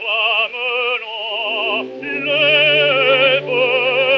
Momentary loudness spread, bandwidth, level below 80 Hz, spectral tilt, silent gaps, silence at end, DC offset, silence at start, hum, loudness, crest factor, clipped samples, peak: 10 LU; 6.4 kHz; -66 dBFS; -5 dB/octave; none; 0 s; under 0.1%; 0 s; none; -15 LUFS; 16 dB; under 0.1%; -2 dBFS